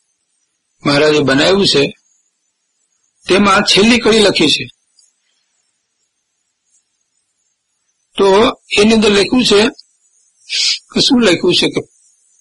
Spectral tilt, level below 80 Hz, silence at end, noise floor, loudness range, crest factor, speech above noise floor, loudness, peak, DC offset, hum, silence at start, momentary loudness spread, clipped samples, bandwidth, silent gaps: -3.5 dB/octave; -42 dBFS; 0.55 s; -68 dBFS; 6 LU; 14 dB; 57 dB; -11 LUFS; 0 dBFS; under 0.1%; none; 0.85 s; 9 LU; under 0.1%; 11.5 kHz; none